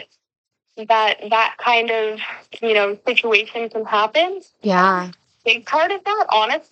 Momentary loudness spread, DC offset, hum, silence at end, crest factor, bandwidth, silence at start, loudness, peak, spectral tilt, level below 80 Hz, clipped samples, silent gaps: 10 LU; under 0.1%; none; 0.1 s; 20 dB; 8.4 kHz; 0 s; -18 LUFS; 0 dBFS; -4 dB/octave; -78 dBFS; under 0.1%; 0.38-0.44 s